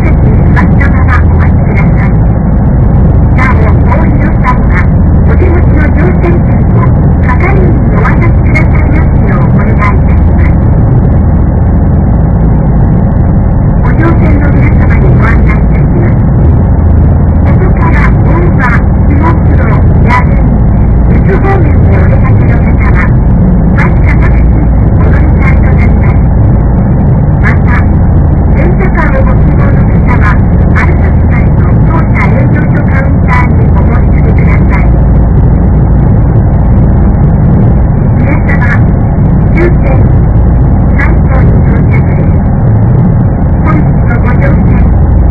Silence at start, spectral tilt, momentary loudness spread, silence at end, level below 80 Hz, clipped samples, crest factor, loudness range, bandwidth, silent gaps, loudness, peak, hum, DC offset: 0 s; -11 dB/octave; 1 LU; 0 s; -8 dBFS; 5%; 4 dB; 1 LU; 4.4 kHz; none; -6 LUFS; 0 dBFS; none; 0.6%